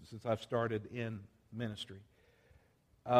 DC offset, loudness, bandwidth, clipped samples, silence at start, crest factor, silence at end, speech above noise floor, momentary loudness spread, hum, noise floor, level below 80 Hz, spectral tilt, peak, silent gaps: under 0.1%; -41 LUFS; 14 kHz; under 0.1%; 0 s; 24 dB; 0 s; 29 dB; 15 LU; none; -69 dBFS; -72 dBFS; -6.5 dB/octave; -16 dBFS; none